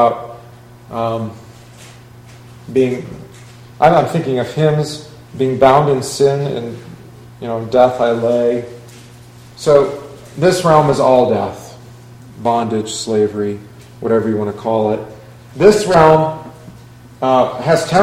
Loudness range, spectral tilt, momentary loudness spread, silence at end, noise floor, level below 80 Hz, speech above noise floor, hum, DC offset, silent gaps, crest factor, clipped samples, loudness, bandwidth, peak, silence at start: 4 LU; -6 dB/octave; 20 LU; 0 s; -39 dBFS; -46 dBFS; 25 dB; none; under 0.1%; none; 16 dB; 0.1%; -15 LUFS; 15.5 kHz; 0 dBFS; 0 s